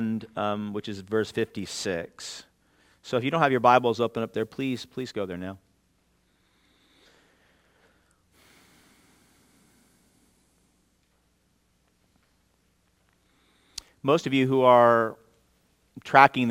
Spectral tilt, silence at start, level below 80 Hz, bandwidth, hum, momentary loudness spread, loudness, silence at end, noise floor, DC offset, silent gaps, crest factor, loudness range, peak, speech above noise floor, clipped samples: -5.5 dB/octave; 0 s; -70 dBFS; 17 kHz; none; 21 LU; -24 LUFS; 0 s; -68 dBFS; under 0.1%; none; 28 dB; 15 LU; 0 dBFS; 45 dB; under 0.1%